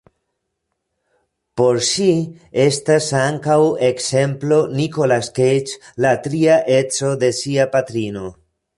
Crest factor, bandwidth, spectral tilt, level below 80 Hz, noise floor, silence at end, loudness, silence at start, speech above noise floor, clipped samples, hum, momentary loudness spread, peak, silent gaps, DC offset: 16 dB; 11.5 kHz; -5 dB/octave; -56 dBFS; -75 dBFS; 0.45 s; -17 LUFS; 1.55 s; 58 dB; under 0.1%; none; 9 LU; -2 dBFS; none; under 0.1%